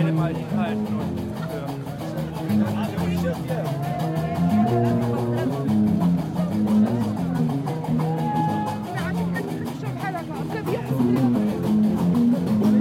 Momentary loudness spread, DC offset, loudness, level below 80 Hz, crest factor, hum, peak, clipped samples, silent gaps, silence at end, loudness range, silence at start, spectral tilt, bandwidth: 9 LU; under 0.1%; -23 LUFS; -52 dBFS; 14 dB; none; -10 dBFS; under 0.1%; none; 0 s; 4 LU; 0 s; -8 dB/octave; 16 kHz